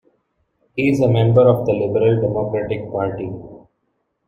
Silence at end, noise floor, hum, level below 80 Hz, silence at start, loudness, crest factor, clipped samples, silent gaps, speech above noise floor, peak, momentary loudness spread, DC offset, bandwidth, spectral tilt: 0.7 s; -70 dBFS; none; -48 dBFS; 0.75 s; -17 LUFS; 16 dB; under 0.1%; none; 54 dB; -2 dBFS; 15 LU; under 0.1%; 7.4 kHz; -8.5 dB/octave